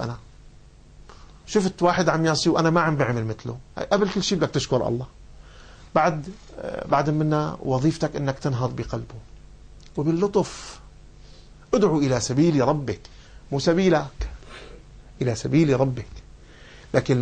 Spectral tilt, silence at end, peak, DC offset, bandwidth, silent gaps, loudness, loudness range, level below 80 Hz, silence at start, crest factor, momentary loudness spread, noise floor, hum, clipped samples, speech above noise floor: -6 dB/octave; 0 s; -6 dBFS; under 0.1%; 9.4 kHz; none; -23 LUFS; 4 LU; -44 dBFS; 0 s; 18 dB; 16 LU; -48 dBFS; none; under 0.1%; 26 dB